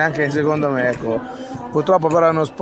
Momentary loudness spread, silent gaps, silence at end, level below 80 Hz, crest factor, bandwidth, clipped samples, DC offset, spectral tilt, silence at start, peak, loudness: 9 LU; none; 0 s; -54 dBFS; 16 dB; 8.4 kHz; under 0.1%; under 0.1%; -7 dB/octave; 0 s; -2 dBFS; -18 LUFS